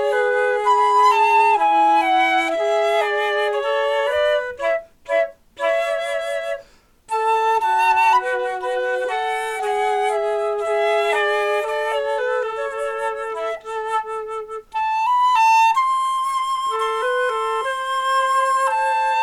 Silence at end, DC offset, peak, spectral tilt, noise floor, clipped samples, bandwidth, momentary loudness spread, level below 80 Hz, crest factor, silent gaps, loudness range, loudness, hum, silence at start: 0 s; under 0.1%; -6 dBFS; -1 dB/octave; -48 dBFS; under 0.1%; 15.5 kHz; 10 LU; -58 dBFS; 12 dB; none; 6 LU; -19 LUFS; none; 0 s